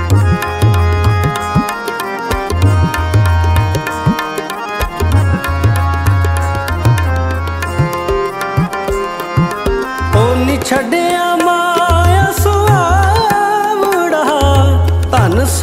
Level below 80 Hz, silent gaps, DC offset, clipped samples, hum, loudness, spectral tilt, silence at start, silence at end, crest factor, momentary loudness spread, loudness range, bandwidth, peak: -22 dBFS; none; under 0.1%; under 0.1%; none; -13 LUFS; -6 dB/octave; 0 s; 0 s; 12 dB; 7 LU; 4 LU; 16 kHz; 0 dBFS